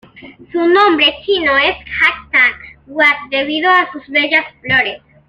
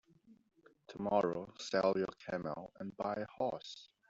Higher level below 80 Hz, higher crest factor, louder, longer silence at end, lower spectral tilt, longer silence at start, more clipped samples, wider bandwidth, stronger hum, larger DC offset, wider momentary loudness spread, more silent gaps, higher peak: first, -48 dBFS vs -74 dBFS; second, 14 dB vs 22 dB; first, -12 LUFS vs -38 LUFS; about the same, 0.3 s vs 0.25 s; about the same, -4.5 dB/octave vs -4.5 dB/octave; second, 0.15 s vs 0.3 s; neither; first, 9.4 kHz vs 7.8 kHz; neither; neither; second, 7 LU vs 13 LU; neither; first, 0 dBFS vs -18 dBFS